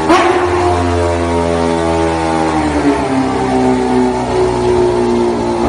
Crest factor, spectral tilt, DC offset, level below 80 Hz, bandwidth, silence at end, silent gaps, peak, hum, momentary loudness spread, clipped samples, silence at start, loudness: 12 dB; -6 dB/octave; under 0.1%; -30 dBFS; 11 kHz; 0 s; none; 0 dBFS; none; 2 LU; under 0.1%; 0 s; -13 LUFS